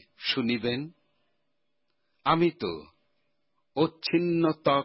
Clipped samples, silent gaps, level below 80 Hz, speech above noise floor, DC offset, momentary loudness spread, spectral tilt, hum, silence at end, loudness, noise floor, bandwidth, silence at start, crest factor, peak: under 0.1%; none; -64 dBFS; 54 dB; under 0.1%; 11 LU; -9.5 dB/octave; none; 0 s; -28 LUFS; -81 dBFS; 5.8 kHz; 0.2 s; 18 dB; -12 dBFS